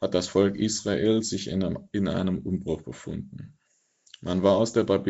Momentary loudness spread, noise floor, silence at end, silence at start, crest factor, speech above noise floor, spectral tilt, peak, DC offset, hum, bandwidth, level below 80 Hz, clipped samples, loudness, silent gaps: 14 LU; -70 dBFS; 0 s; 0 s; 18 dB; 45 dB; -6 dB/octave; -8 dBFS; under 0.1%; none; 8 kHz; -56 dBFS; under 0.1%; -26 LUFS; none